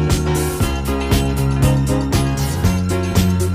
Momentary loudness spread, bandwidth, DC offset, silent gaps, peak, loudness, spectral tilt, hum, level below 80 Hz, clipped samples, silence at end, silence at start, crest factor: 3 LU; 16 kHz; under 0.1%; none; -2 dBFS; -18 LUFS; -6 dB/octave; none; -24 dBFS; under 0.1%; 0 s; 0 s; 14 dB